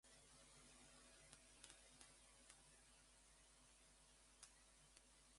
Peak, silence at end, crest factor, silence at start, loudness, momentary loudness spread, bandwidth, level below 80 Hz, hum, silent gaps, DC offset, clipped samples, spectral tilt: -38 dBFS; 0 s; 32 dB; 0.05 s; -67 LUFS; 5 LU; 11.5 kHz; -78 dBFS; none; none; under 0.1%; under 0.1%; -1.5 dB/octave